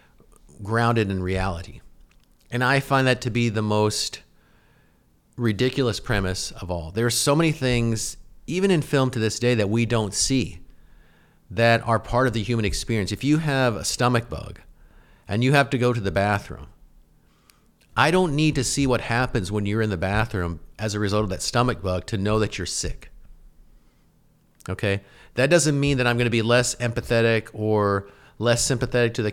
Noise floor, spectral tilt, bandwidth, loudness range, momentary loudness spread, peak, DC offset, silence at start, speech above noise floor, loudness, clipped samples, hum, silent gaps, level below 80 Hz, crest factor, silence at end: -60 dBFS; -5 dB/octave; 16 kHz; 4 LU; 10 LU; -4 dBFS; under 0.1%; 0.6 s; 38 dB; -23 LUFS; under 0.1%; none; none; -42 dBFS; 20 dB; 0 s